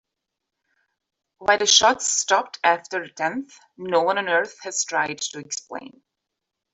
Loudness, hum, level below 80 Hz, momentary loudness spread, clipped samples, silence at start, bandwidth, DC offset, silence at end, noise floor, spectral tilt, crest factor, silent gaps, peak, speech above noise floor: -21 LUFS; none; -68 dBFS; 16 LU; under 0.1%; 1.4 s; 8.2 kHz; under 0.1%; 0.85 s; -83 dBFS; -0.5 dB/octave; 22 dB; none; -2 dBFS; 60 dB